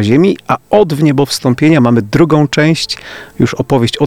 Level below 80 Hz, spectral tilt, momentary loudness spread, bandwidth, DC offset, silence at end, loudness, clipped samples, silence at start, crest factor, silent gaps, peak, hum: -42 dBFS; -6 dB/octave; 7 LU; 16 kHz; 0.5%; 0 s; -11 LUFS; under 0.1%; 0 s; 10 dB; none; 0 dBFS; none